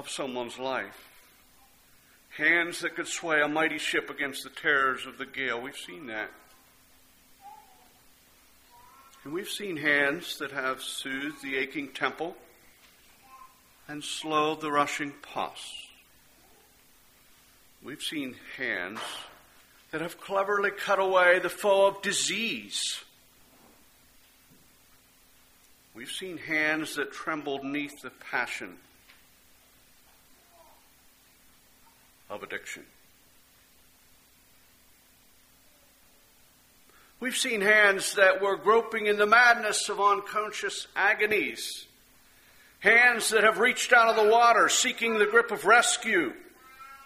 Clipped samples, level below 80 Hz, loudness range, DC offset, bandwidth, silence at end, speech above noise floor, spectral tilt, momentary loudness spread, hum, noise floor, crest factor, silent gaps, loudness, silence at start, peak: under 0.1%; -70 dBFS; 22 LU; under 0.1%; 15.5 kHz; 0 s; 34 dB; -1.5 dB/octave; 18 LU; none; -60 dBFS; 24 dB; none; -26 LUFS; 0 s; -6 dBFS